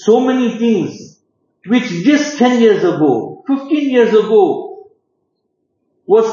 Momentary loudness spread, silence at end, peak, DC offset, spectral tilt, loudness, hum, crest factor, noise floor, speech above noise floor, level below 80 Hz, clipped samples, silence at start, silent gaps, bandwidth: 9 LU; 0 s; 0 dBFS; under 0.1%; -5.5 dB/octave; -13 LUFS; none; 14 dB; -68 dBFS; 56 dB; -70 dBFS; under 0.1%; 0 s; none; 7.4 kHz